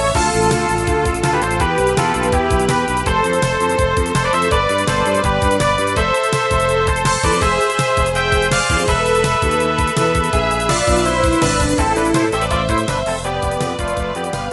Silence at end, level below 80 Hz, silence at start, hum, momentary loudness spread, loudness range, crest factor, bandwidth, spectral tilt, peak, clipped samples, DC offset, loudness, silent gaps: 0 s; -26 dBFS; 0 s; none; 3 LU; 1 LU; 14 dB; 12.5 kHz; -4.5 dB/octave; -2 dBFS; under 0.1%; under 0.1%; -16 LUFS; none